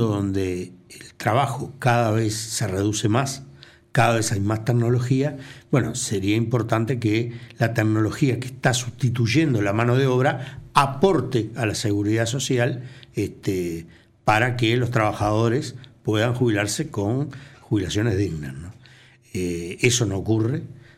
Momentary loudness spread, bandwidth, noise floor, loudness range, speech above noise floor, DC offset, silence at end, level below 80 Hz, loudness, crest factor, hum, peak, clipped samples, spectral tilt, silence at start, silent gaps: 11 LU; 14.5 kHz; -51 dBFS; 3 LU; 29 dB; under 0.1%; 0.2 s; -50 dBFS; -22 LUFS; 18 dB; none; -4 dBFS; under 0.1%; -5.5 dB/octave; 0 s; none